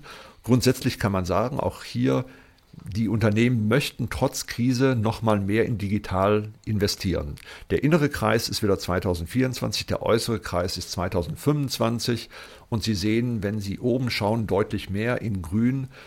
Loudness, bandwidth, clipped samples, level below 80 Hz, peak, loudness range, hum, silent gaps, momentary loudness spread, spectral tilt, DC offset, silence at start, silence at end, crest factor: -25 LUFS; 16.5 kHz; under 0.1%; -48 dBFS; -6 dBFS; 2 LU; none; none; 7 LU; -6 dB/octave; under 0.1%; 0 s; 0 s; 18 dB